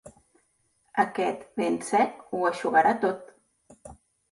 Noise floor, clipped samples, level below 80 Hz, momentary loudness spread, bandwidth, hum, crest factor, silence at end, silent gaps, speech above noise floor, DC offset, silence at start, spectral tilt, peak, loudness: -70 dBFS; under 0.1%; -66 dBFS; 8 LU; 11.5 kHz; none; 20 dB; 0.4 s; none; 45 dB; under 0.1%; 0.05 s; -4.5 dB/octave; -8 dBFS; -26 LUFS